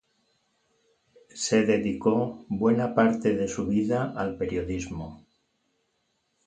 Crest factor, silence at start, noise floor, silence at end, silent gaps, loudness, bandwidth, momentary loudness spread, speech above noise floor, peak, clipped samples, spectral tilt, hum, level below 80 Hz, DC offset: 20 dB; 1.35 s; -74 dBFS; 1.3 s; none; -26 LUFS; 9.2 kHz; 10 LU; 49 dB; -8 dBFS; under 0.1%; -5.5 dB/octave; none; -52 dBFS; under 0.1%